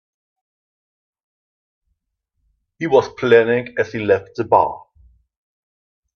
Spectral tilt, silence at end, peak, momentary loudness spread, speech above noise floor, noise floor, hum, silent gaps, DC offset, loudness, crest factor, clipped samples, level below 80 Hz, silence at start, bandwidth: -6.5 dB/octave; 1.4 s; 0 dBFS; 9 LU; 58 dB; -75 dBFS; none; none; under 0.1%; -17 LUFS; 20 dB; under 0.1%; -58 dBFS; 2.8 s; 6.6 kHz